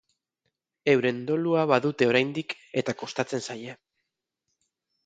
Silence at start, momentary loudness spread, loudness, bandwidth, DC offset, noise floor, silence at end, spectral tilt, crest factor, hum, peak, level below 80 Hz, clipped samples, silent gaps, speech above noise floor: 0.85 s; 11 LU; -26 LUFS; 9.2 kHz; under 0.1%; -82 dBFS; 1.3 s; -5.5 dB/octave; 22 dB; none; -6 dBFS; -72 dBFS; under 0.1%; none; 57 dB